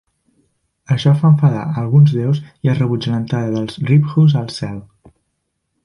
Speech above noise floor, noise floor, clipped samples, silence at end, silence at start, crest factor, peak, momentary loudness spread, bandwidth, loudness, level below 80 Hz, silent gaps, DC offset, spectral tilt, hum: 57 dB; -71 dBFS; under 0.1%; 1.05 s; 0.9 s; 14 dB; -2 dBFS; 9 LU; 10.5 kHz; -15 LUFS; -52 dBFS; none; under 0.1%; -8.5 dB/octave; none